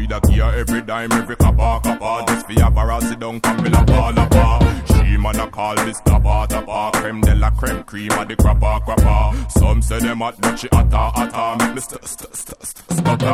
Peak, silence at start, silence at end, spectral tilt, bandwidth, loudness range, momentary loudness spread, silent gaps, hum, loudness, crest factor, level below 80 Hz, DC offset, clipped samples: 0 dBFS; 0 s; 0 s; -6 dB/octave; 15.5 kHz; 3 LU; 7 LU; none; none; -17 LUFS; 14 dB; -18 dBFS; under 0.1%; under 0.1%